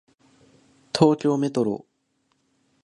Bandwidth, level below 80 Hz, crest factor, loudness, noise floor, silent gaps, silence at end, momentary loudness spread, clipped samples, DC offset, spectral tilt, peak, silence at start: 11 kHz; -62 dBFS; 22 dB; -23 LUFS; -71 dBFS; none; 1.05 s; 11 LU; under 0.1%; under 0.1%; -6.5 dB/octave; -2 dBFS; 0.95 s